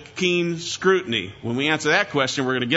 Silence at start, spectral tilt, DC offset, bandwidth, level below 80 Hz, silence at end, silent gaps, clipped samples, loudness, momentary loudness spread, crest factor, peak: 0 s; -4 dB/octave; under 0.1%; 8 kHz; -60 dBFS; 0 s; none; under 0.1%; -21 LUFS; 6 LU; 18 dB; -4 dBFS